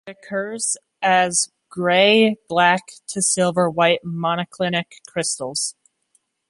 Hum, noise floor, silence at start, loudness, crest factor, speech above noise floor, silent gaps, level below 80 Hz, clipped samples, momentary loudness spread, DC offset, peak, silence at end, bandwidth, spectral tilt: none; -66 dBFS; 0.05 s; -19 LUFS; 18 dB; 46 dB; none; -66 dBFS; under 0.1%; 11 LU; under 0.1%; -2 dBFS; 0.8 s; 11.5 kHz; -3 dB/octave